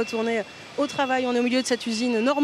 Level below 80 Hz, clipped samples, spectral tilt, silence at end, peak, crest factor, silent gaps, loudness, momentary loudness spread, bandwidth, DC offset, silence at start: -74 dBFS; under 0.1%; -3.5 dB/octave; 0 s; -10 dBFS; 14 dB; none; -25 LUFS; 6 LU; 13.5 kHz; under 0.1%; 0 s